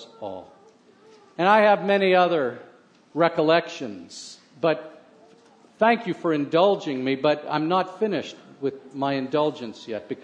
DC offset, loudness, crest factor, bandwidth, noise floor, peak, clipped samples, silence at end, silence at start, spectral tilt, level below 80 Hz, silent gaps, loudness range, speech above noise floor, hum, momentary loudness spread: under 0.1%; -23 LUFS; 20 dB; 9.6 kHz; -54 dBFS; -4 dBFS; under 0.1%; 0.05 s; 0 s; -6 dB/octave; -76 dBFS; none; 4 LU; 32 dB; none; 18 LU